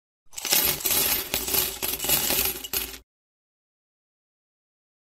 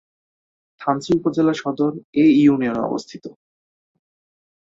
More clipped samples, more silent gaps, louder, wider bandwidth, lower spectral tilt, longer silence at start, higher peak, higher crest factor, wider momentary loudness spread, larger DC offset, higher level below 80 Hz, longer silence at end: neither; second, none vs 2.04-2.13 s; second, -23 LUFS vs -19 LUFS; first, 16.5 kHz vs 7.8 kHz; second, -0.5 dB/octave vs -7 dB/octave; second, 0.25 s vs 0.8 s; about the same, -2 dBFS vs -4 dBFS; first, 26 dB vs 16 dB; second, 9 LU vs 14 LU; neither; first, -50 dBFS vs -58 dBFS; first, 2.05 s vs 1.35 s